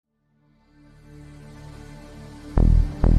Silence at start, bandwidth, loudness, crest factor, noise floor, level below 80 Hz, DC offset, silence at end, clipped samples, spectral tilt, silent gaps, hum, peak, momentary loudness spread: 2.15 s; 5.6 kHz; -22 LUFS; 16 dB; -64 dBFS; -26 dBFS; under 0.1%; 0 s; under 0.1%; -9 dB/octave; none; none; -6 dBFS; 24 LU